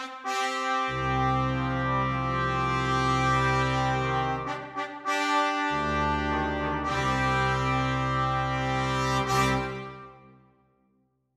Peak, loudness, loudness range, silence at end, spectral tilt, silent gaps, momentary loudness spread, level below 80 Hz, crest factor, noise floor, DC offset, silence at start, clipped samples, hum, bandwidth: -10 dBFS; -27 LUFS; 2 LU; 1.2 s; -5 dB/octave; none; 6 LU; -42 dBFS; 16 dB; -70 dBFS; under 0.1%; 0 s; under 0.1%; none; 13.5 kHz